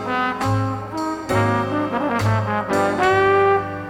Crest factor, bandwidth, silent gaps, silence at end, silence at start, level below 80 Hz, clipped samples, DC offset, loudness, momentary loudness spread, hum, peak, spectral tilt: 16 dB; 15.5 kHz; none; 0 s; 0 s; -48 dBFS; under 0.1%; under 0.1%; -20 LUFS; 9 LU; none; -4 dBFS; -6.5 dB/octave